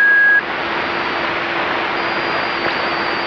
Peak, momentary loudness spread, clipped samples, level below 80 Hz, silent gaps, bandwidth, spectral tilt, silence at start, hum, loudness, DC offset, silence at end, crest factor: -4 dBFS; 8 LU; under 0.1%; -52 dBFS; none; 7.2 kHz; -4.5 dB/octave; 0 s; none; -16 LUFS; under 0.1%; 0 s; 12 dB